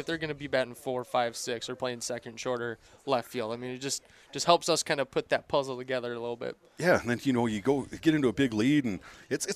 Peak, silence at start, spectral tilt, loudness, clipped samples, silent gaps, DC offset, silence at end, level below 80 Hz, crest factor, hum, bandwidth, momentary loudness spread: -6 dBFS; 0 s; -4 dB/octave; -30 LUFS; under 0.1%; none; under 0.1%; 0 s; -62 dBFS; 24 dB; none; 15.5 kHz; 10 LU